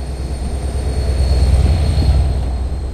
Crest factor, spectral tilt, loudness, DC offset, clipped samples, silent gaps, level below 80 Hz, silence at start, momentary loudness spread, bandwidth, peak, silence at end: 12 dB; -6.5 dB/octave; -17 LUFS; under 0.1%; under 0.1%; none; -16 dBFS; 0 s; 9 LU; 10 kHz; -2 dBFS; 0 s